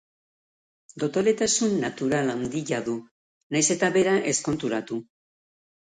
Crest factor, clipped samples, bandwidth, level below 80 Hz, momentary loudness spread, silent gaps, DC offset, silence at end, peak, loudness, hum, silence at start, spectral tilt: 18 dB; under 0.1%; 9.6 kHz; -62 dBFS; 10 LU; 3.11-3.50 s; under 0.1%; 0.8 s; -8 dBFS; -25 LUFS; none; 0.95 s; -3.5 dB/octave